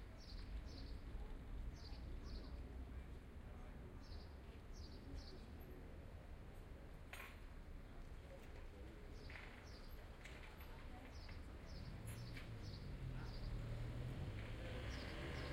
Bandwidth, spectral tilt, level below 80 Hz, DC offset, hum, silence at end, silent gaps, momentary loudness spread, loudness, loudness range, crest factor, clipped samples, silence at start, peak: 16 kHz; -6 dB/octave; -54 dBFS; under 0.1%; none; 0 s; none; 9 LU; -55 LUFS; 7 LU; 16 dB; under 0.1%; 0 s; -36 dBFS